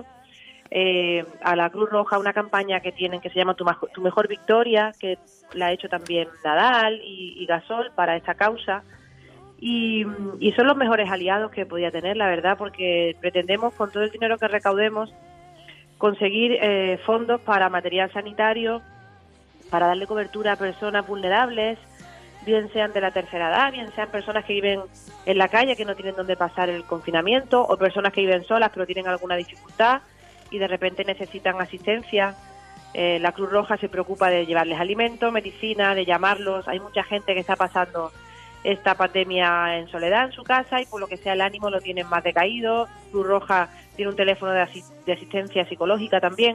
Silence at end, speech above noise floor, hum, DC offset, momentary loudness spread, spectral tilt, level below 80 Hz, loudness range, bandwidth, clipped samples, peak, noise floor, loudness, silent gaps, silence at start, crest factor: 0 s; 29 dB; none; under 0.1%; 8 LU; -5 dB/octave; -58 dBFS; 3 LU; 12 kHz; under 0.1%; -6 dBFS; -52 dBFS; -23 LUFS; none; 0 s; 18 dB